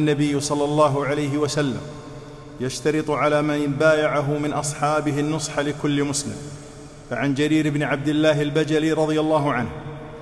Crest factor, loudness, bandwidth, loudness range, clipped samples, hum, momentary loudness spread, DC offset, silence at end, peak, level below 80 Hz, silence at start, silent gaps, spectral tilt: 18 dB; -22 LUFS; 12.5 kHz; 2 LU; under 0.1%; none; 16 LU; under 0.1%; 0 s; -4 dBFS; -48 dBFS; 0 s; none; -5.5 dB/octave